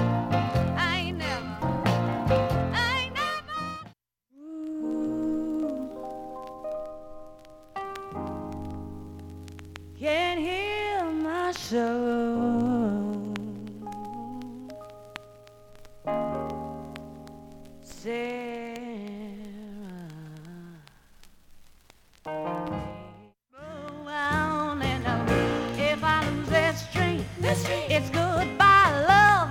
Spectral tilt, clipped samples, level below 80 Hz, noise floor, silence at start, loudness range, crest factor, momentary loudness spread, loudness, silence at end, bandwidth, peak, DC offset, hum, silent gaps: -5.5 dB/octave; under 0.1%; -48 dBFS; -59 dBFS; 0 s; 13 LU; 22 dB; 19 LU; -27 LUFS; 0 s; 17 kHz; -6 dBFS; under 0.1%; none; none